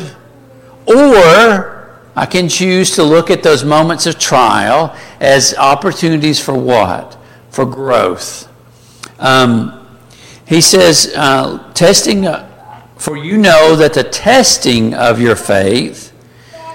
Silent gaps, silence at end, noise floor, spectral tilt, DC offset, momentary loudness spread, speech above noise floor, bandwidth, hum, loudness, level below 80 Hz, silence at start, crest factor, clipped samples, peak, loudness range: none; 0 s; -41 dBFS; -3.5 dB/octave; under 0.1%; 15 LU; 31 dB; 17 kHz; none; -9 LUFS; -42 dBFS; 0 s; 10 dB; under 0.1%; 0 dBFS; 5 LU